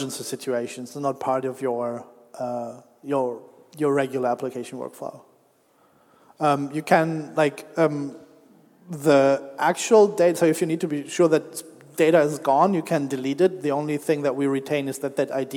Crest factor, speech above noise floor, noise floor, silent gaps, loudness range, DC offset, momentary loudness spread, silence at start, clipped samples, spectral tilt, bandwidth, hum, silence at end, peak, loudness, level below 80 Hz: 20 dB; 38 dB; -61 dBFS; none; 8 LU; under 0.1%; 15 LU; 0 s; under 0.1%; -5.5 dB/octave; 18 kHz; none; 0 s; -4 dBFS; -23 LUFS; -78 dBFS